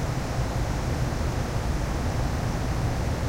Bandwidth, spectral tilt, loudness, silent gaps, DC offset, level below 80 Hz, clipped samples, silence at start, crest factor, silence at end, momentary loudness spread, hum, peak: 16 kHz; -6 dB/octave; -28 LUFS; none; under 0.1%; -30 dBFS; under 0.1%; 0 s; 12 dB; 0 s; 1 LU; none; -14 dBFS